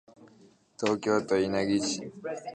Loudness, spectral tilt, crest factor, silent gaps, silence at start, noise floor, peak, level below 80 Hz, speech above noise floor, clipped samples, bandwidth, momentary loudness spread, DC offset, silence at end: -29 LUFS; -4.5 dB/octave; 18 dB; none; 0.2 s; -59 dBFS; -12 dBFS; -64 dBFS; 31 dB; under 0.1%; 9.8 kHz; 10 LU; under 0.1%; 0 s